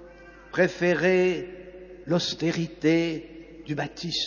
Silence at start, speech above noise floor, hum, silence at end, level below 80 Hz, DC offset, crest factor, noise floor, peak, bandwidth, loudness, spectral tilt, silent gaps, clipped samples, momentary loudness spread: 0 s; 23 dB; none; 0 s; -56 dBFS; under 0.1%; 18 dB; -48 dBFS; -8 dBFS; 7.2 kHz; -25 LUFS; -5.5 dB/octave; none; under 0.1%; 21 LU